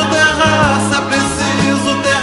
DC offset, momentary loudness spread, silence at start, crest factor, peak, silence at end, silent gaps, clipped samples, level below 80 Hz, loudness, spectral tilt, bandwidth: under 0.1%; 4 LU; 0 s; 12 dB; 0 dBFS; 0 s; none; under 0.1%; -34 dBFS; -13 LUFS; -4 dB/octave; 12 kHz